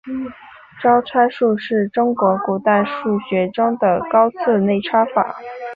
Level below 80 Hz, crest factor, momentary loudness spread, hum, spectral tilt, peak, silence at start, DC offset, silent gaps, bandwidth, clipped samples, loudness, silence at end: -60 dBFS; 16 dB; 6 LU; none; -9 dB/octave; -2 dBFS; 0.05 s; under 0.1%; none; 5 kHz; under 0.1%; -17 LUFS; 0 s